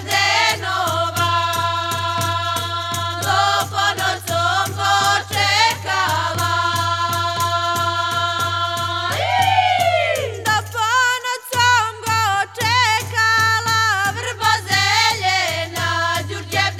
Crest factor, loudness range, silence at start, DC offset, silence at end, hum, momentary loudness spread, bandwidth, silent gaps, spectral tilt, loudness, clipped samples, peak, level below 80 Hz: 18 dB; 3 LU; 0 s; under 0.1%; 0 s; none; 6 LU; 19 kHz; none; -2 dB/octave; -17 LUFS; under 0.1%; -2 dBFS; -60 dBFS